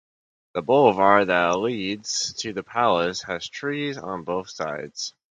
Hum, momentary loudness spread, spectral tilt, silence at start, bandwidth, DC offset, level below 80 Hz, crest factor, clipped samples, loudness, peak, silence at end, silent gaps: none; 13 LU; -3.5 dB/octave; 0.55 s; 9.6 kHz; under 0.1%; -60 dBFS; 22 dB; under 0.1%; -23 LUFS; 0 dBFS; 0.2 s; none